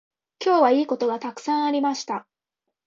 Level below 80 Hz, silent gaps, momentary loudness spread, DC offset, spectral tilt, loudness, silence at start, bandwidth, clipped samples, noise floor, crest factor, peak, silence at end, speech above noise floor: -76 dBFS; none; 11 LU; under 0.1%; -3.5 dB/octave; -23 LUFS; 0.4 s; 7.6 kHz; under 0.1%; -83 dBFS; 18 dB; -6 dBFS; 0.65 s; 61 dB